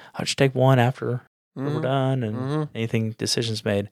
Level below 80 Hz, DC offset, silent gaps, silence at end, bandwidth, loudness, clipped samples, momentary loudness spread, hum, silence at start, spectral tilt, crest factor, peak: -66 dBFS; under 0.1%; 1.27-1.51 s; 0.05 s; 14 kHz; -24 LUFS; under 0.1%; 11 LU; none; 0 s; -5.5 dB/octave; 20 dB; -4 dBFS